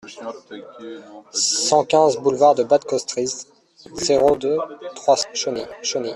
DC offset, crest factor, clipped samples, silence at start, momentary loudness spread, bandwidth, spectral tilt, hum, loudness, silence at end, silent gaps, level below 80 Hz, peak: under 0.1%; 18 dB; under 0.1%; 0.05 s; 20 LU; 12 kHz; -2.5 dB/octave; none; -19 LUFS; 0 s; none; -58 dBFS; -2 dBFS